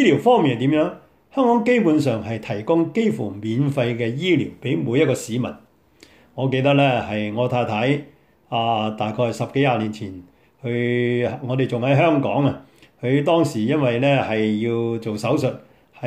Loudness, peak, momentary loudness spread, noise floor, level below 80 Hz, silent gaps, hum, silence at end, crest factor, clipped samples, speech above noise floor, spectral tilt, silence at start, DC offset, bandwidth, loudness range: -20 LUFS; -4 dBFS; 10 LU; -52 dBFS; -60 dBFS; none; none; 0 s; 16 dB; under 0.1%; 33 dB; -7 dB/octave; 0 s; under 0.1%; 14.5 kHz; 3 LU